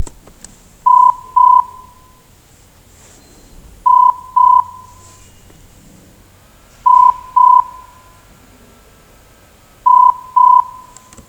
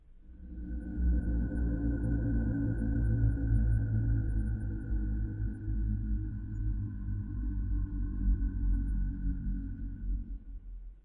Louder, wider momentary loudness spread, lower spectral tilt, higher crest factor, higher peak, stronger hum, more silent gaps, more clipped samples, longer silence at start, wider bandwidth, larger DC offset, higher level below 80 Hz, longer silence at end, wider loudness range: first, -10 LUFS vs -34 LUFS; about the same, 12 LU vs 11 LU; second, -3.5 dB/octave vs -12 dB/octave; about the same, 14 dB vs 14 dB; first, 0 dBFS vs -18 dBFS; neither; neither; neither; about the same, 0 s vs 0.1 s; first, 9.4 kHz vs 1.8 kHz; neither; second, -46 dBFS vs -34 dBFS; first, 0.6 s vs 0.05 s; second, 1 LU vs 5 LU